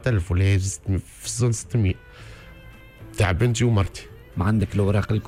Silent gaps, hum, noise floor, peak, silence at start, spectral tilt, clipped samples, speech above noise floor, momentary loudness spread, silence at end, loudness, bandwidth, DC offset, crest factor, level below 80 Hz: none; none; -44 dBFS; -10 dBFS; 0 s; -6 dB/octave; under 0.1%; 23 dB; 19 LU; 0 s; -23 LUFS; 13.5 kHz; under 0.1%; 14 dB; -40 dBFS